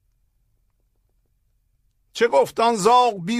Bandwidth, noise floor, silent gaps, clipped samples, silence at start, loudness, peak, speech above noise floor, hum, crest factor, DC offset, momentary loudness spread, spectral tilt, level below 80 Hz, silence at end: 15.5 kHz; -66 dBFS; none; under 0.1%; 2.15 s; -18 LUFS; -4 dBFS; 48 dB; none; 18 dB; under 0.1%; 7 LU; -4 dB/octave; -64 dBFS; 0 s